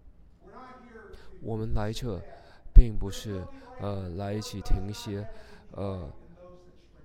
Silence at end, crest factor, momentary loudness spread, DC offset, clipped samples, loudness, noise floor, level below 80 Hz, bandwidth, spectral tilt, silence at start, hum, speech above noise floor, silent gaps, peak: 0.55 s; 26 dB; 26 LU; under 0.1%; under 0.1%; -32 LUFS; -53 dBFS; -28 dBFS; 9.2 kHz; -6.5 dB/octave; 0.05 s; none; 22 dB; none; 0 dBFS